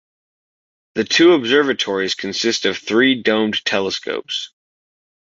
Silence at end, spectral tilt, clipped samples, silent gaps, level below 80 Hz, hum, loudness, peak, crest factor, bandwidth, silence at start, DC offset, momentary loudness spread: 0.9 s; -3 dB/octave; under 0.1%; none; -60 dBFS; none; -17 LUFS; 0 dBFS; 18 dB; 7.8 kHz; 0.95 s; under 0.1%; 12 LU